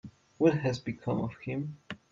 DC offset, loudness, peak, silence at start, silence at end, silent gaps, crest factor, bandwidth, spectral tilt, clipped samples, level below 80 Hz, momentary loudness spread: under 0.1%; -32 LUFS; -12 dBFS; 0.05 s; 0.15 s; none; 20 dB; 7.6 kHz; -7.5 dB/octave; under 0.1%; -64 dBFS; 12 LU